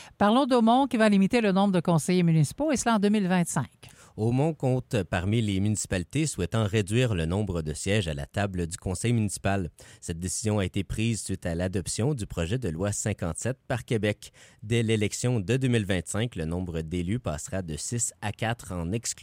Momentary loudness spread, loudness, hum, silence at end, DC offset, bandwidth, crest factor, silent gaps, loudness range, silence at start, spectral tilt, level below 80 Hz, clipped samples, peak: 10 LU; -27 LUFS; none; 0 s; under 0.1%; 16 kHz; 18 dB; none; 6 LU; 0 s; -5.5 dB/octave; -48 dBFS; under 0.1%; -8 dBFS